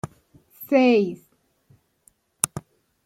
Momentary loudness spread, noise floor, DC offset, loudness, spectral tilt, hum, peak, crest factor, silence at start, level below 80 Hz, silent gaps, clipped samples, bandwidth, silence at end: 24 LU; -62 dBFS; under 0.1%; -21 LUFS; -4.5 dB/octave; none; 0 dBFS; 26 dB; 0.05 s; -64 dBFS; none; under 0.1%; 16.5 kHz; 0.45 s